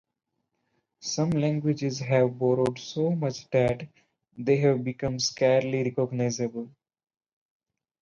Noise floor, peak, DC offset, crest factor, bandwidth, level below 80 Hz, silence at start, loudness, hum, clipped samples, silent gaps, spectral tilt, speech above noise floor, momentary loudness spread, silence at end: -81 dBFS; -8 dBFS; under 0.1%; 18 dB; 10.5 kHz; -60 dBFS; 1 s; -26 LUFS; none; under 0.1%; none; -5.5 dB/octave; 55 dB; 10 LU; 1.3 s